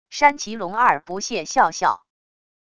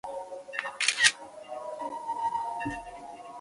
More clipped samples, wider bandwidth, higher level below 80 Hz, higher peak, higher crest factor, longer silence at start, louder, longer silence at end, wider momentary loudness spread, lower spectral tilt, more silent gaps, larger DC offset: neither; second, 10 kHz vs 11.5 kHz; about the same, -60 dBFS vs -62 dBFS; about the same, -2 dBFS vs -4 dBFS; second, 20 dB vs 30 dB; about the same, 0.1 s vs 0.05 s; first, -20 LUFS vs -29 LUFS; first, 0.8 s vs 0 s; second, 9 LU vs 21 LU; first, -2.5 dB/octave vs 0 dB/octave; neither; first, 0.4% vs under 0.1%